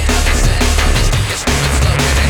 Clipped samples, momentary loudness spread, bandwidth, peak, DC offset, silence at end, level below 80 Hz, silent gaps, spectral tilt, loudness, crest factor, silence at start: under 0.1%; 2 LU; 19 kHz; 0 dBFS; under 0.1%; 0 s; -14 dBFS; none; -4 dB/octave; -14 LUFS; 12 dB; 0 s